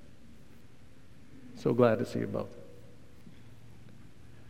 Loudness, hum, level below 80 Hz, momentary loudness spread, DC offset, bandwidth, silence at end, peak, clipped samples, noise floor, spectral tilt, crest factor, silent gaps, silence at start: -30 LUFS; none; -64 dBFS; 29 LU; 0.4%; 15.5 kHz; 1 s; -10 dBFS; under 0.1%; -57 dBFS; -7.5 dB/octave; 26 dB; none; 1.35 s